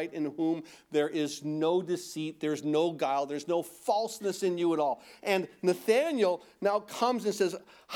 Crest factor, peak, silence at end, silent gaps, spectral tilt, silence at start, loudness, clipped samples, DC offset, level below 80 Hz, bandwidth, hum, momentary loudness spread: 18 dB; -12 dBFS; 0 s; none; -5 dB/octave; 0 s; -30 LUFS; under 0.1%; under 0.1%; -80 dBFS; 18.5 kHz; none; 6 LU